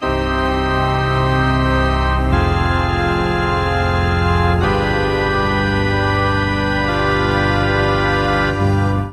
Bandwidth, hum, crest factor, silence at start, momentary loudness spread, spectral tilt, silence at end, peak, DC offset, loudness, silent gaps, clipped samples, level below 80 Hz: 12 kHz; none; 12 dB; 0 s; 2 LU; -6.5 dB/octave; 0 s; -2 dBFS; under 0.1%; -16 LUFS; none; under 0.1%; -24 dBFS